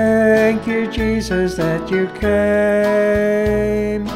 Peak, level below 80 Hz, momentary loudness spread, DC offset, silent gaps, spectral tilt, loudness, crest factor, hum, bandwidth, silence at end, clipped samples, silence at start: -2 dBFS; -34 dBFS; 6 LU; under 0.1%; none; -6.5 dB/octave; -16 LUFS; 14 dB; none; 15 kHz; 0 s; under 0.1%; 0 s